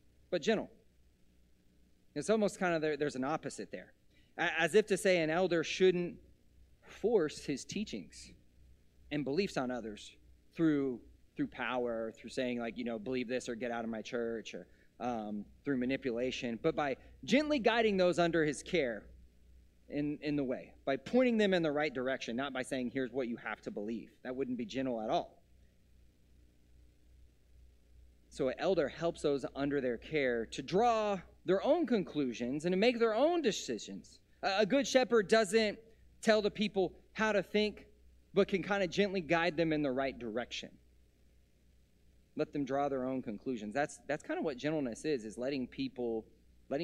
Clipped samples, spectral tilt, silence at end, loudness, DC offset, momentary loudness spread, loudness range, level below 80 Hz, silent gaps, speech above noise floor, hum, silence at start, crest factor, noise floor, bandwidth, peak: under 0.1%; -5 dB/octave; 0 s; -34 LUFS; under 0.1%; 13 LU; 8 LU; -64 dBFS; none; 33 dB; none; 0.3 s; 20 dB; -67 dBFS; 13 kHz; -14 dBFS